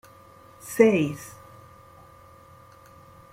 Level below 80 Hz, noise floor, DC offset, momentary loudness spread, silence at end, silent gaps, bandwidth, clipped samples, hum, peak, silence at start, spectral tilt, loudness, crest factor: -64 dBFS; -51 dBFS; under 0.1%; 25 LU; 2.05 s; none; 16 kHz; under 0.1%; none; -4 dBFS; 0.65 s; -6 dB/octave; -22 LUFS; 24 dB